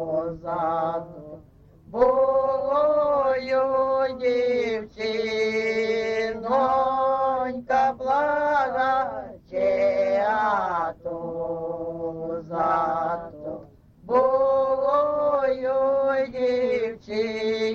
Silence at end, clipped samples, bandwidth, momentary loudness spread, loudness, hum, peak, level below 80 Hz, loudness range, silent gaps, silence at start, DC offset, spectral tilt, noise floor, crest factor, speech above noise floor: 0 s; under 0.1%; 7.2 kHz; 10 LU; -24 LUFS; none; -8 dBFS; -56 dBFS; 3 LU; none; 0 s; under 0.1%; -5.5 dB/octave; -48 dBFS; 16 dB; 24 dB